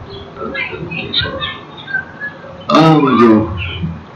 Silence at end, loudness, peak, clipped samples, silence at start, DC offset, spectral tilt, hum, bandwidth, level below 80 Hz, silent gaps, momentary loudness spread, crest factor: 0 s; -14 LUFS; 0 dBFS; 0.3%; 0 s; under 0.1%; -7 dB/octave; none; 7.8 kHz; -40 dBFS; none; 18 LU; 14 dB